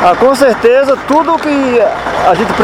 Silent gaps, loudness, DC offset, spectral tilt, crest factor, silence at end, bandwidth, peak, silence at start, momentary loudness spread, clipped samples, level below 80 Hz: none; -10 LUFS; under 0.1%; -5 dB/octave; 10 dB; 0 s; 15.5 kHz; 0 dBFS; 0 s; 4 LU; 0.4%; -38 dBFS